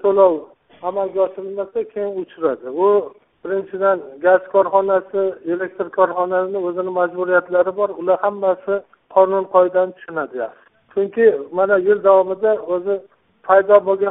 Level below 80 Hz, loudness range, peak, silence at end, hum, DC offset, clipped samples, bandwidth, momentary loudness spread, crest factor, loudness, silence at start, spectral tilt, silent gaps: -66 dBFS; 3 LU; 0 dBFS; 0 s; none; under 0.1%; under 0.1%; 3.9 kHz; 11 LU; 18 dB; -18 LUFS; 0.05 s; 0 dB/octave; none